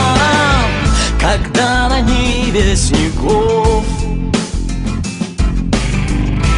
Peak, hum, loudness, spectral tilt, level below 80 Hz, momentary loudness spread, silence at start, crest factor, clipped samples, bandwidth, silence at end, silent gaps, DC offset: 0 dBFS; none; -14 LUFS; -5 dB/octave; -18 dBFS; 8 LU; 0 s; 12 dB; under 0.1%; 11 kHz; 0 s; none; under 0.1%